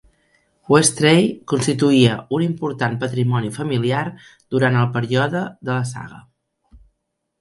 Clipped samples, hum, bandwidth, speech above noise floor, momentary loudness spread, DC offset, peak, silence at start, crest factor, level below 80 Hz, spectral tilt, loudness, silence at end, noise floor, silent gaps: under 0.1%; none; 11.5 kHz; 56 dB; 10 LU; under 0.1%; 0 dBFS; 0.7 s; 18 dB; -56 dBFS; -5 dB/octave; -18 LUFS; 1.2 s; -75 dBFS; none